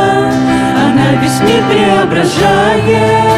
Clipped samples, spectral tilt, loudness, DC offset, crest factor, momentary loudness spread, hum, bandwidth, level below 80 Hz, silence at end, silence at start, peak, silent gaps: under 0.1%; -5.5 dB/octave; -9 LUFS; under 0.1%; 8 dB; 2 LU; none; 15.5 kHz; -36 dBFS; 0 s; 0 s; 0 dBFS; none